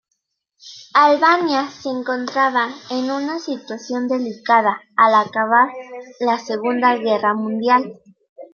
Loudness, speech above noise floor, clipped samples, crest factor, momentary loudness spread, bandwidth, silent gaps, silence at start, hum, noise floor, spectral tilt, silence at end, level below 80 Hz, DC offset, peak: -18 LUFS; 56 dB; under 0.1%; 18 dB; 12 LU; 7 kHz; 8.29-8.36 s; 0.65 s; none; -74 dBFS; -4.5 dB/octave; 0.05 s; -72 dBFS; under 0.1%; 0 dBFS